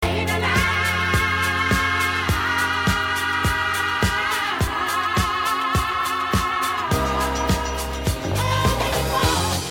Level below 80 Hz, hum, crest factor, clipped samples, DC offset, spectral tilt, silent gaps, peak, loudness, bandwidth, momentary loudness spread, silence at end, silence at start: -32 dBFS; none; 16 dB; under 0.1%; under 0.1%; -4 dB/octave; none; -6 dBFS; -21 LUFS; 17 kHz; 3 LU; 0 s; 0 s